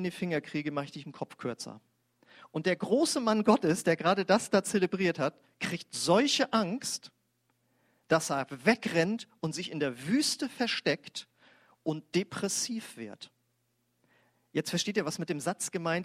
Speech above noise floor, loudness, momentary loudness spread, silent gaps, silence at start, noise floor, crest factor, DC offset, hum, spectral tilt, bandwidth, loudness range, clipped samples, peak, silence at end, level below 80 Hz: 46 dB; -30 LUFS; 13 LU; none; 0 s; -76 dBFS; 22 dB; under 0.1%; none; -4 dB/octave; 16 kHz; 8 LU; under 0.1%; -10 dBFS; 0 s; -74 dBFS